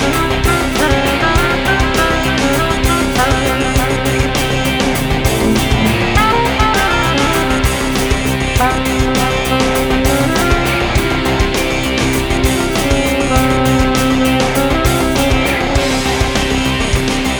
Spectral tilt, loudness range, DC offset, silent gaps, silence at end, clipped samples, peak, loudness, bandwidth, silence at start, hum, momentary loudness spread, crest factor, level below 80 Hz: -4.5 dB/octave; 1 LU; under 0.1%; none; 0 s; under 0.1%; 0 dBFS; -13 LUFS; over 20 kHz; 0 s; none; 2 LU; 14 dB; -22 dBFS